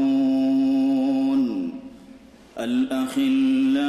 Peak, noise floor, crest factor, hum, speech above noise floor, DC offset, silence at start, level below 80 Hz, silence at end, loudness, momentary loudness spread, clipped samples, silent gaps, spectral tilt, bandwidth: -14 dBFS; -47 dBFS; 8 dB; none; 26 dB; under 0.1%; 0 s; -60 dBFS; 0 s; -22 LUFS; 12 LU; under 0.1%; none; -5.5 dB/octave; 12.5 kHz